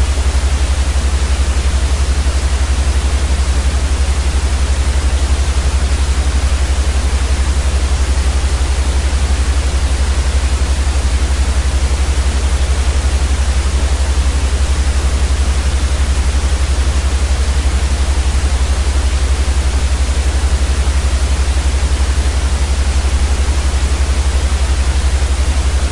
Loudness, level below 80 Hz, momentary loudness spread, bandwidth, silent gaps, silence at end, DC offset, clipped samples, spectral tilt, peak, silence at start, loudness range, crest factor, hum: -15 LUFS; -14 dBFS; 1 LU; 11.5 kHz; none; 0 s; under 0.1%; under 0.1%; -4.5 dB/octave; -2 dBFS; 0 s; 0 LU; 10 dB; none